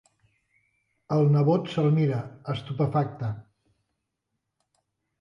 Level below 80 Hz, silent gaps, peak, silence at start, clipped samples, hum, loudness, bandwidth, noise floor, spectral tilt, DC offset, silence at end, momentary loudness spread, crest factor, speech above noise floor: -62 dBFS; none; -10 dBFS; 1.1 s; under 0.1%; none; -26 LUFS; 7 kHz; -81 dBFS; -9.5 dB/octave; under 0.1%; 1.8 s; 13 LU; 18 dB; 57 dB